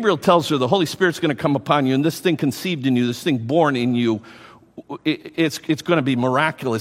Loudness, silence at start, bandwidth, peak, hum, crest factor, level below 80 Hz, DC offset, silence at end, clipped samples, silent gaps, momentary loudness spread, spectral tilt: -20 LUFS; 0 s; 16 kHz; 0 dBFS; none; 20 dB; -62 dBFS; under 0.1%; 0 s; under 0.1%; none; 7 LU; -5.5 dB/octave